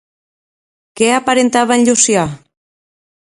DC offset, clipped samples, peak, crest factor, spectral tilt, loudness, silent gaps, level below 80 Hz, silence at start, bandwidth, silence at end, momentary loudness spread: under 0.1%; under 0.1%; 0 dBFS; 16 dB; -3 dB/octave; -12 LUFS; none; -54 dBFS; 0.95 s; 11.5 kHz; 0.9 s; 6 LU